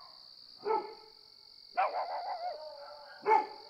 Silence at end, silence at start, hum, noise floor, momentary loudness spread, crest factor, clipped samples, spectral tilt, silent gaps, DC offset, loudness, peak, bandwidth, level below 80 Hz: 0 s; 0 s; none; -57 dBFS; 23 LU; 22 dB; under 0.1%; -3.5 dB/octave; none; under 0.1%; -35 LUFS; -14 dBFS; 10 kHz; -82 dBFS